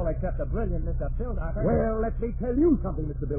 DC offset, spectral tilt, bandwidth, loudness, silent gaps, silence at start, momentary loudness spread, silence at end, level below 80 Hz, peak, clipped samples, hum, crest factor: under 0.1%; -14 dB/octave; 2.7 kHz; -28 LUFS; none; 0 s; 9 LU; 0 s; -30 dBFS; -12 dBFS; under 0.1%; none; 14 dB